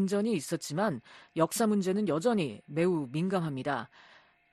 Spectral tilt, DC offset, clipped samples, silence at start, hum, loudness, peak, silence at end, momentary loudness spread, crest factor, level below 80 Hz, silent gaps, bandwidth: -5.5 dB/octave; under 0.1%; under 0.1%; 0 s; none; -31 LUFS; -12 dBFS; 0.65 s; 7 LU; 18 dB; -72 dBFS; none; 13 kHz